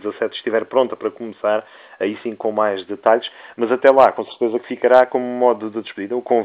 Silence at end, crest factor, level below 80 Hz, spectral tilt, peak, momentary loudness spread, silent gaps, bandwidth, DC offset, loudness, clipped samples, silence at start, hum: 0 s; 18 dB; -68 dBFS; -6.5 dB/octave; 0 dBFS; 12 LU; none; 5.4 kHz; under 0.1%; -18 LUFS; under 0.1%; 0.05 s; none